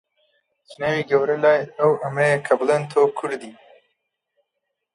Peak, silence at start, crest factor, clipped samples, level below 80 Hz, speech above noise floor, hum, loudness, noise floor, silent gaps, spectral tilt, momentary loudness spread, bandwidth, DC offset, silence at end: -4 dBFS; 0.7 s; 18 dB; under 0.1%; -68 dBFS; 59 dB; none; -20 LUFS; -79 dBFS; none; -6 dB/octave; 10 LU; 11 kHz; under 0.1%; 1.4 s